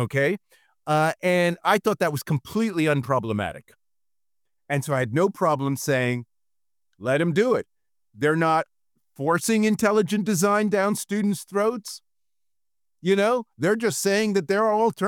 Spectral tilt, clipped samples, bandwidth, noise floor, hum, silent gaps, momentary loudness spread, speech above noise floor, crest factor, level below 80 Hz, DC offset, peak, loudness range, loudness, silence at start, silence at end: -5.5 dB/octave; under 0.1%; 19 kHz; under -90 dBFS; none; none; 8 LU; over 67 dB; 18 dB; -66 dBFS; under 0.1%; -6 dBFS; 3 LU; -23 LUFS; 0 s; 0 s